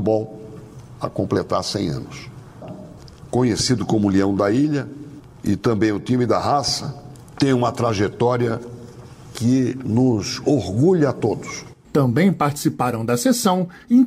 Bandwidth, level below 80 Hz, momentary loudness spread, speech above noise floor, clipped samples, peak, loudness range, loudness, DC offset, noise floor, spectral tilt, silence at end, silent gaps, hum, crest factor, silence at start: 16 kHz; -50 dBFS; 20 LU; 21 dB; under 0.1%; -6 dBFS; 3 LU; -20 LUFS; under 0.1%; -40 dBFS; -6 dB/octave; 0 s; none; none; 14 dB; 0 s